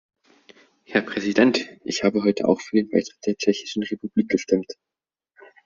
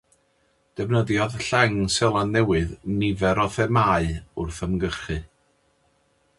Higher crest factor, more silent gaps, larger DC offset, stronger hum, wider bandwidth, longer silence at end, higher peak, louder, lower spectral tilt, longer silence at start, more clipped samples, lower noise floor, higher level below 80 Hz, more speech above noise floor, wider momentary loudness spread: about the same, 20 dB vs 22 dB; neither; neither; neither; second, 7.4 kHz vs 11.5 kHz; second, 0.9 s vs 1.15 s; about the same, -4 dBFS vs -2 dBFS; about the same, -23 LUFS vs -23 LUFS; about the same, -5 dB/octave vs -5.5 dB/octave; first, 0.9 s vs 0.75 s; neither; second, -61 dBFS vs -66 dBFS; second, -64 dBFS vs -40 dBFS; second, 39 dB vs 43 dB; about the same, 9 LU vs 11 LU